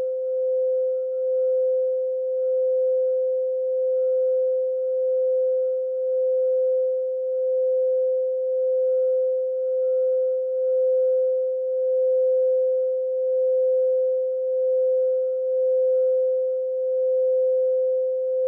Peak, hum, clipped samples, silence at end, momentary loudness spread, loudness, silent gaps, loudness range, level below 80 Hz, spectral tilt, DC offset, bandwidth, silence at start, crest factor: -16 dBFS; none; under 0.1%; 0 s; 4 LU; -22 LUFS; none; 1 LU; under -90 dBFS; -5.5 dB/octave; under 0.1%; 1.4 kHz; 0 s; 6 dB